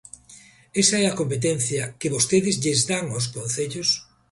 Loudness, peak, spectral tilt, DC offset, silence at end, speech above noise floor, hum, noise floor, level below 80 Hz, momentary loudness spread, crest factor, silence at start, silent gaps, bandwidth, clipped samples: -22 LUFS; -4 dBFS; -3.5 dB/octave; under 0.1%; 0.3 s; 27 dB; none; -50 dBFS; -58 dBFS; 8 LU; 20 dB; 0.3 s; none; 11.5 kHz; under 0.1%